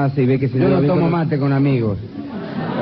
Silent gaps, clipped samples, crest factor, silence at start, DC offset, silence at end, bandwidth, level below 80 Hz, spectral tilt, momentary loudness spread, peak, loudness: none; under 0.1%; 12 dB; 0 s; under 0.1%; 0 s; 5.6 kHz; -46 dBFS; -11 dB/octave; 12 LU; -6 dBFS; -18 LUFS